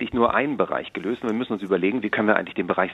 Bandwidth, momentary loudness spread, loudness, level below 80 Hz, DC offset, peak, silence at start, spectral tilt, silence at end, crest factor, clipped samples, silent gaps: 8 kHz; 6 LU; -23 LUFS; -56 dBFS; under 0.1%; -2 dBFS; 0 s; -7.5 dB/octave; 0 s; 20 dB; under 0.1%; none